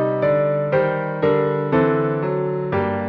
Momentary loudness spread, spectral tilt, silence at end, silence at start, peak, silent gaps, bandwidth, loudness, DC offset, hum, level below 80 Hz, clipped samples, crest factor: 4 LU; -10.5 dB/octave; 0 s; 0 s; -6 dBFS; none; 5.2 kHz; -20 LUFS; under 0.1%; none; -54 dBFS; under 0.1%; 12 dB